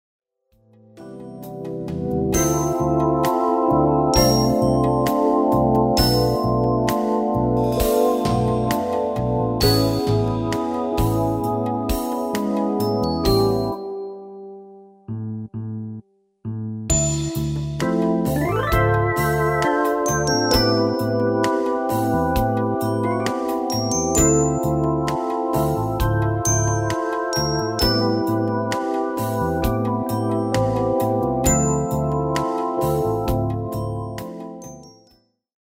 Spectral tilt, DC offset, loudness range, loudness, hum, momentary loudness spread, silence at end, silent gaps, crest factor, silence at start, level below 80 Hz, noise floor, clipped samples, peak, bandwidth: -5 dB/octave; under 0.1%; 6 LU; -20 LUFS; none; 13 LU; 0.85 s; none; 20 dB; 0.95 s; -34 dBFS; -60 dBFS; under 0.1%; 0 dBFS; 16.5 kHz